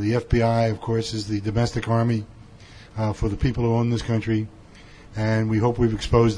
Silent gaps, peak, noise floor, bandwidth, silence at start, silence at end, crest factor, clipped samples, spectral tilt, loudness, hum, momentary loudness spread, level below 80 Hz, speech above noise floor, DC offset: none; -6 dBFS; -45 dBFS; 10.5 kHz; 0 s; 0 s; 16 dB; under 0.1%; -7 dB/octave; -23 LUFS; none; 8 LU; -36 dBFS; 24 dB; under 0.1%